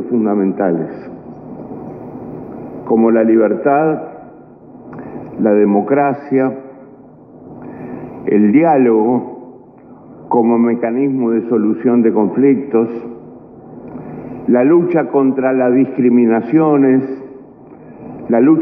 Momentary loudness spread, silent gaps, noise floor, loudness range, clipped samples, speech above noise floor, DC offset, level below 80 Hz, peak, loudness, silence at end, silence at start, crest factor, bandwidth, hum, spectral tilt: 20 LU; none; -39 dBFS; 4 LU; under 0.1%; 27 dB; under 0.1%; -58 dBFS; 0 dBFS; -13 LUFS; 0 s; 0 s; 14 dB; 2.9 kHz; none; -12.5 dB/octave